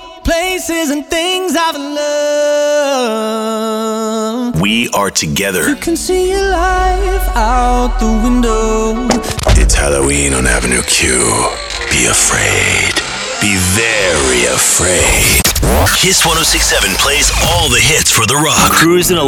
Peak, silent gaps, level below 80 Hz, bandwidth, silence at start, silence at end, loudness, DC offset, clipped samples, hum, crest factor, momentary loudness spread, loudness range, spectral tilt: 0 dBFS; none; -20 dBFS; 19 kHz; 0 s; 0 s; -11 LUFS; under 0.1%; under 0.1%; none; 12 dB; 8 LU; 5 LU; -2.5 dB/octave